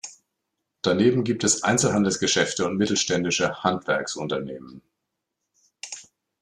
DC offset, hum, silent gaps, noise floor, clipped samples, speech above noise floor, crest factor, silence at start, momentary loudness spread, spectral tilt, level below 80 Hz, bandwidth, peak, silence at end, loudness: under 0.1%; none; none; -81 dBFS; under 0.1%; 58 dB; 20 dB; 0.05 s; 17 LU; -3.5 dB/octave; -62 dBFS; 13 kHz; -6 dBFS; 0.4 s; -23 LUFS